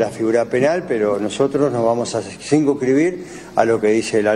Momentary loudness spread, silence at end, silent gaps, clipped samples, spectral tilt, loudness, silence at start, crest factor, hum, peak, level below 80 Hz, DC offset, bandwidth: 5 LU; 0 s; none; under 0.1%; -5.5 dB/octave; -18 LUFS; 0 s; 16 dB; none; 0 dBFS; -54 dBFS; under 0.1%; 12 kHz